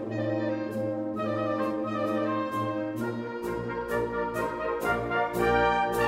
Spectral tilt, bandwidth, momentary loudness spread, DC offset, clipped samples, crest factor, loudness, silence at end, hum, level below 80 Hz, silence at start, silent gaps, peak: -6.5 dB/octave; 16 kHz; 8 LU; under 0.1%; under 0.1%; 16 dB; -29 LUFS; 0 s; none; -50 dBFS; 0 s; none; -12 dBFS